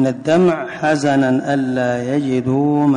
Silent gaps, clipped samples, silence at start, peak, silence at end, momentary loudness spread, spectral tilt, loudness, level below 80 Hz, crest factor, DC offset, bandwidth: none; under 0.1%; 0 s; -6 dBFS; 0 s; 4 LU; -7 dB/octave; -17 LUFS; -54 dBFS; 10 dB; under 0.1%; 10.5 kHz